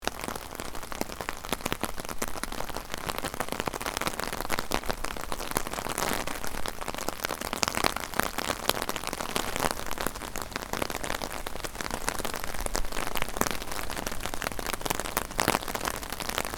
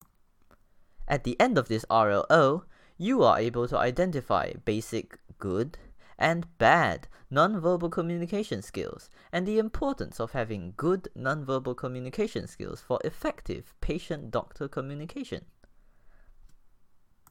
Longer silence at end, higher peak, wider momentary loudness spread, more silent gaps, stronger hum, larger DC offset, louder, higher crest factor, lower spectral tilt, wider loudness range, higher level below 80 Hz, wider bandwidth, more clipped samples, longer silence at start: second, 0 s vs 0.75 s; first, 0 dBFS vs -6 dBFS; second, 7 LU vs 15 LU; neither; neither; neither; second, -32 LUFS vs -28 LUFS; first, 30 dB vs 22 dB; second, -2.5 dB/octave vs -6 dB/octave; second, 3 LU vs 10 LU; first, -42 dBFS vs -48 dBFS; first, over 20 kHz vs 16.5 kHz; neither; second, 0 s vs 1 s